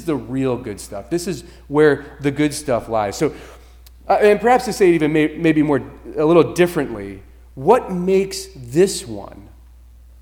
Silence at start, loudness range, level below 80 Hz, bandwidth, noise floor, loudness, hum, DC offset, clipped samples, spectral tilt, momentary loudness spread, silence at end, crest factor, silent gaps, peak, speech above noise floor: 0 s; 5 LU; -44 dBFS; 18.5 kHz; -44 dBFS; -18 LUFS; none; under 0.1%; under 0.1%; -5.5 dB/octave; 15 LU; 0.8 s; 18 dB; none; 0 dBFS; 26 dB